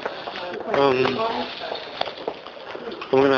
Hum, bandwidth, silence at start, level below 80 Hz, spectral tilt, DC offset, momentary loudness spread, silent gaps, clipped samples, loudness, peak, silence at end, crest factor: none; 7 kHz; 0 s; -58 dBFS; -6 dB/octave; under 0.1%; 14 LU; none; under 0.1%; -25 LUFS; -4 dBFS; 0 s; 20 dB